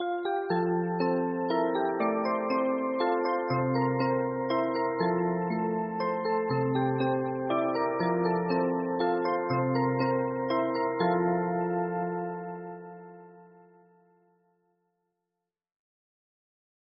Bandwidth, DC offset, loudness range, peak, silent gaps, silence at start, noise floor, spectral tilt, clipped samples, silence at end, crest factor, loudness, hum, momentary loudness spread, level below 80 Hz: 5.4 kHz; under 0.1%; 6 LU; -14 dBFS; none; 0 s; -87 dBFS; -6 dB/octave; under 0.1%; 3.55 s; 16 dB; -29 LUFS; none; 4 LU; -68 dBFS